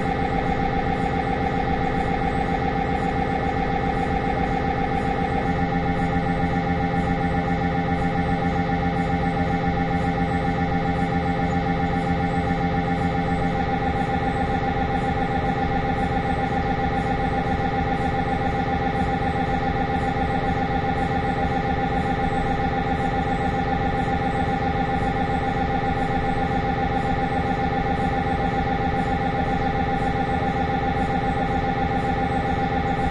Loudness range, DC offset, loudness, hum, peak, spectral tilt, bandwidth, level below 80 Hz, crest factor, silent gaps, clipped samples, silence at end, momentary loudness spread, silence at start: 0 LU; under 0.1%; -23 LUFS; none; -8 dBFS; -7.5 dB/octave; 11 kHz; -34 dBFS; 14 dB; none; under 0.1%; 0 s; 1 LU; 0 s